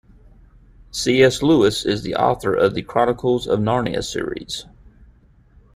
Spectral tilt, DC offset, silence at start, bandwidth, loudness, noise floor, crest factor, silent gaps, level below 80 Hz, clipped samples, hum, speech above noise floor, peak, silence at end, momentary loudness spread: -5 dB/octave; under 0.1%; 0.95 s; 15.5 kHz; -19 LUFS; -51 dBFS; 18 dB; none; -46 dBFS; under 0.1%; none; 33 dB; -2 dBFS; 1.15 s; 12 LU